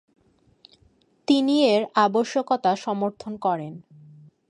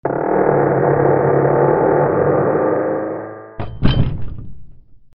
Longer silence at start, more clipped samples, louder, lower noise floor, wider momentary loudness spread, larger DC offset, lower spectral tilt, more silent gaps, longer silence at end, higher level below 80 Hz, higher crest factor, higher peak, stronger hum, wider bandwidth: first, 1.3 s vs 0.05 s; neither; second, -23 LUFS vs -16 LUFS; first, -61 dBFS vs -38 dBFS; second, 12 LU vs 16 LU; neither; second, -5.5 dB/octave vs -7 dB/octave; neither; first, 0.7 s vs 0.2 s; second, -70 dBFS vs -34 dBFS; about the same, 18 dB vs 16 dB; second, -6 dBFS vs 0 dBFS; neither; first, 10.5 kHz vs 5.4 kHz